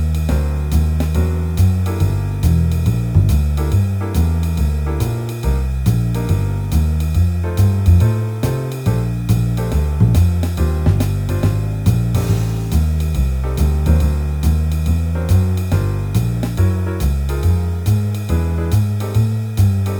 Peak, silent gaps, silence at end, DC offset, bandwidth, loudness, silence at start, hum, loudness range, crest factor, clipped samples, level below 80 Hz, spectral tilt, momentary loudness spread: 0 dBFS; none; 0 s; under 0.1%; over 20 kHz; -17 LUFS; 0 s; none; 1 LU; 14 dB; under 0.1%; -20 dBFS; -7.5 dB/octave; 4 LU